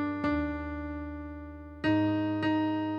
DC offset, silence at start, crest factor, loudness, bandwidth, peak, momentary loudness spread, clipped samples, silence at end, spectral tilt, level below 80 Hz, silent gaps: under 0.1%; 0 s; 16 dB; -31 LUFS; 5.6 kHz; -14 dBFS; 14 LU; under 0.1%; 0 s; -8.5 dB/octave; -48 dBFS; none